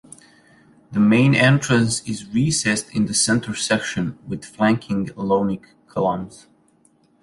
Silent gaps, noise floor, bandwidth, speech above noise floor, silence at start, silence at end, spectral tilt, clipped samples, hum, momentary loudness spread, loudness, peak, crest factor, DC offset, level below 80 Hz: none; -59 dBFS; 11.5 kHz; 39 dB; 0.9 s; 0.85 s; -4.5 dB/octave; under 0.1%; none; 13 LU; -20 LUFS; -2 dBFS; 18 dB; under 0.1%; -52 dBFS